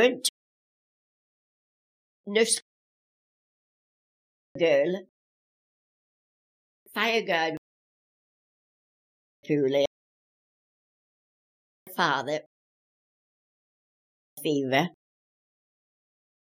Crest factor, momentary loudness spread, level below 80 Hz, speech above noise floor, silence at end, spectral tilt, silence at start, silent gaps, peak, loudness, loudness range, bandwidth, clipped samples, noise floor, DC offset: 24 dB; 13 LU; -80 dBFS; over 65 dB; 1.7 s; -3.5 dB/octave; 0 s; 0.29-2.24 s, 2.62-4.55 s, 5.09-6.86 s, 7.58-9.43 s, 9.87-11.86 s, 12.46-14.37 s; -8 dBFS; -27 LUFS; 5 LU; 14.5 kHz; under 0.1%; under -90 dBFS; under 0.1%